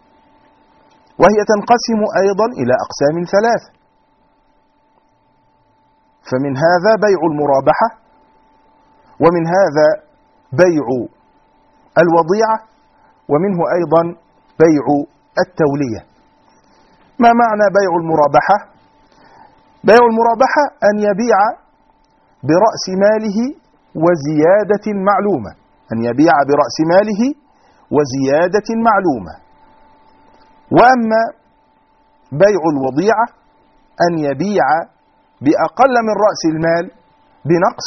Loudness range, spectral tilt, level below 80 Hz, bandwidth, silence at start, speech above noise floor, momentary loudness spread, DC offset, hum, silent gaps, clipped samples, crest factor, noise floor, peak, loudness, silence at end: 3 LU; -5 dB/octave; -52 dBFS; 6.4 kHz; 1.2 s; 43 dB; 9 LU; under 0.1%; none; none; under 0.1%; 14 dB; -56 dBFS; 0 dBFS; -14 LUFS; 0 s